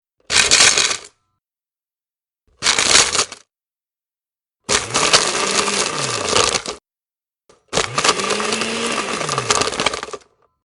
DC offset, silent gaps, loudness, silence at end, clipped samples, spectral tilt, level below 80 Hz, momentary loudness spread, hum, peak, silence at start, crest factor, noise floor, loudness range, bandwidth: under 0.1%; none; -15 LUFS; 0.5 s; under 0.1%; -0.5 dB/octave; -50 dBFS; 12 LU; none; 0 dBFS; 0.3 s; 20 dB; under -90 dBFS; 4 LU; 12.5 kHz